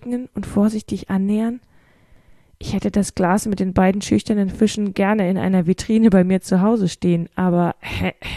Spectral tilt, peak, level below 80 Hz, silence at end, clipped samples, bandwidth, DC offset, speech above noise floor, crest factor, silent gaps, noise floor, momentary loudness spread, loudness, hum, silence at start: -6.5 dB/octave; -2 dBFS; -42 dBFS; 0 s; under 0.1%; 13 kHz; under 0.1%; 33 dB; 18 dB; none; -51 dBFS; 8 LU; -19 LUFS; none; 0 s